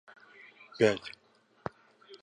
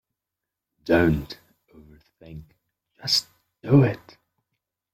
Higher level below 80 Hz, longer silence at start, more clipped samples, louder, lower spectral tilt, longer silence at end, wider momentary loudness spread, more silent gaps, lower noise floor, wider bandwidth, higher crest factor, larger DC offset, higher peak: second, -70 dBFS vs -48 dBFS; about the same, 0.8 s vs 0.85 s; neither; second, -32 LUFS vs -22 LUFS; about the same, -5.5 dB/octave vs -5.5 dB/octave; second, 0.05 s vs 0.95 s; about the same, 25 LU vs 25 LU; neither; second, -57 dBFS vs -86 dBFS; second, 10 kHz vs 16 kHz; about the same, 24 dB vs 22 dB; neither; second, -10 dBFS vs -6 dBFS